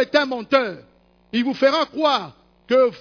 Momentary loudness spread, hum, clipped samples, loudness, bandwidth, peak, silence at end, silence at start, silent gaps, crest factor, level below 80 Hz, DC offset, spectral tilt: 10 LU; none; under 0.1%; -20 LUFS; 5.4 kHz; -4 dBFS; 0.05 s; 0 s; none; 16 dB; -64 dBFS; under 0.1%; -4.5 dB/octave